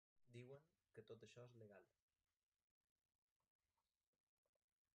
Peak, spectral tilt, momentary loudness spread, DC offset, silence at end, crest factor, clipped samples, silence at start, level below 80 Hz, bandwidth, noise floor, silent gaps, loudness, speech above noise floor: -48 dBFS; -6 dB/octave; 5 LU; under 0.1%; 3.05 s; 22 dB; under 0.1%; 0.15 s; under -90 dBFS; 6.8 kHz; under -90 dBFS; none; -65 LUFS; over 25 dB